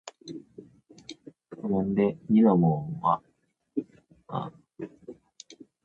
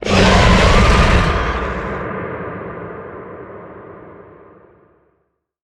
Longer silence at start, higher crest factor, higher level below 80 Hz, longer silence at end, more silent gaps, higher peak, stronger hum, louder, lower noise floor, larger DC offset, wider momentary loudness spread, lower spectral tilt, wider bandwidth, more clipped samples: about the same, 0.05 s vs 0 s; about the same, 20 dB vs 16 dB; second, -62 dBFS vs -22 dBFS; second, 0.3 s vs 1.4 s; neither; second, -10 dBFS vs 0 dBFS; neither; second, -26 LUFS vs -14 LUFS; second, -61 dBFS vs -67 dBFS; neither; first, 27 LU vs 24 LU; first, -8.5 dB/octave vs -5.5 dB/octave; second, 7.6 kHz vs 11.5 kHz; neither